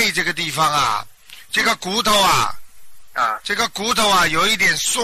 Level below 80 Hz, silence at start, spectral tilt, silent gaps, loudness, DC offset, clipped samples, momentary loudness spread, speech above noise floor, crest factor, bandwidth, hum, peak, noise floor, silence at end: -46 dBFS; 0 s; -1.5 dB/octave; none; -17 LUFS; under 0.1%; under 0.1%; 8 LU; 21 dB; 14 dB; 15 kHz; none; -6 dBFS; -39 dBFS; 0 s